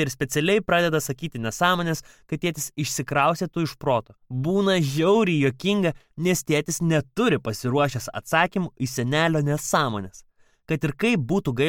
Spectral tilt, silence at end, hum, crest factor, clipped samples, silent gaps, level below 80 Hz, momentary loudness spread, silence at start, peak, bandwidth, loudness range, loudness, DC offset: -5 dB/octave; 0 s; none; 18 dB; under 0.1%; none; -52 dBFS; 8 LU; 0 s; -6 dBFS; 17.5 kHz; 2 LU; -23 LUFS; under 0.1%